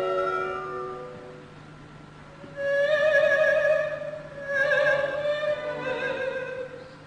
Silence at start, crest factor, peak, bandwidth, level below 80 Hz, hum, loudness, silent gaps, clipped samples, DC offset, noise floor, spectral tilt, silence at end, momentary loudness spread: 0 s; 16 dB; -10 dBFS; 10 kHz; -60 dBFS; 50 Hz at -50 dBFS; -25 LUFS; none; under 0.1%; under 0.1%; -46 dBFS; -4.5 dB/octave; 0 s; 25 LU